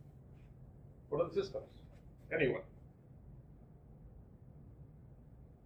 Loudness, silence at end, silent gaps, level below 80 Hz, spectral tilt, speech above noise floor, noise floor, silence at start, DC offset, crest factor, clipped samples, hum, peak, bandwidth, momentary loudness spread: -38 LUFS; 0.1 s; none; -62 dBFS; -7.5 dB/octave; 21 dB; -58 dBFS; 0.05 s; under 0.1%; 24 dB; under 0.1%; none; -20 dBFS; 8 kHz; 24 LU